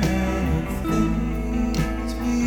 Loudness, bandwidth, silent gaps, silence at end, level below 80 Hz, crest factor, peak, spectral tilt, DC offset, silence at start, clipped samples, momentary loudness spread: -24 LUFS; 19 kHz; none; 0 s; -28 dBFS; 14 dB; -8 dBFS; -6.5 dB/octave; 0.4%; 0 s; under 0.1%; 3 LU